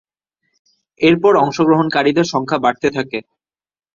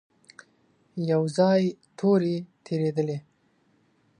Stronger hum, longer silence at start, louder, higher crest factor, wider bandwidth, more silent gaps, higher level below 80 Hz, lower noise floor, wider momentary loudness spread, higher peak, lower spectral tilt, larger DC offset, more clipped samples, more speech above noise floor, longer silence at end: neither; about the same, 1 s vs 0.95 s; first, -15 LUFS vs -26 LUFS; about the same, 16 dB vs 18 dB; second, 7.4 kHz vs 10.5 kHz; neither; first, -56 dBFS vs -74 dBFS; first, -72 dBFS vs -66 dBFS; about the same, 9 LU vs 11 LU; first, -2 dBFS vs -10 dBFS; second, -6 dB/octave vs -7.5 dB/octave; neither; neither; first, 58 dB vs 42 dB; second, 0.75 s vs 1 s